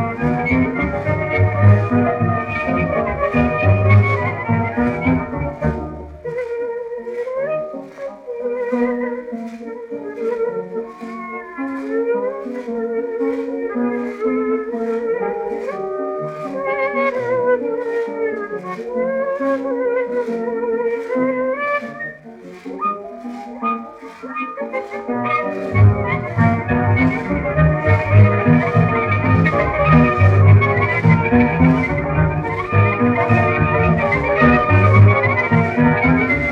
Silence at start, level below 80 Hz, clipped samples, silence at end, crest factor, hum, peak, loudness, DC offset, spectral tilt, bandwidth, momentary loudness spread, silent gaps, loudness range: 0 s; -38 dBFS; under 0.1%; 0 s; 16 dB; none; 0 dBFS; -17 LUFS; under 0.1%; -9.5 dB/octave; 5.8 kHz; 14 LU; none; 10 LU